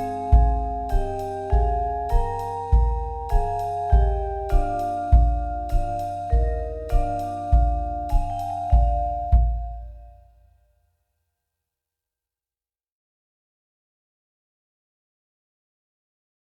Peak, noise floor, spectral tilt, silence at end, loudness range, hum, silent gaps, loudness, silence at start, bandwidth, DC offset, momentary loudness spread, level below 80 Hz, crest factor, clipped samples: -4 dBFS; under -90 dBFS; -8.5 dB/octave; 6.45 s; 3 LU; none; none; -24 LUFS; 0 s; 5.6 kHz; under 0.1%; 9 LU; -24 dBFS; 20 dB; under 0.1%